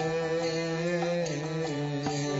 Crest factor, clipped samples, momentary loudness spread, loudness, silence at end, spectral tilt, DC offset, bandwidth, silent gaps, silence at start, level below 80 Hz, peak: 12 dB; under 0.1%; 3 LU; -30 LUFS; 0 s; -5.5 dB/octave; under 0.1%; 8 kHz; none; 0 s; -62 dBFS; -18 dBFS